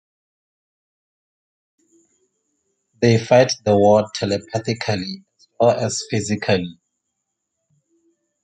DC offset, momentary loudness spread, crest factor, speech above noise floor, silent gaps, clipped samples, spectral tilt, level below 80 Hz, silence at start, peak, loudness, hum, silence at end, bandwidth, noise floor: under 0.1%; 11 LU; 22 dB; 60 dB; none; under 0.1%; -5 dB/octave; -60 dBFS; 3 s; 0 dBFS; -18 LUFS; none; 1.7 s; 9.4 kHz; -77 dBFS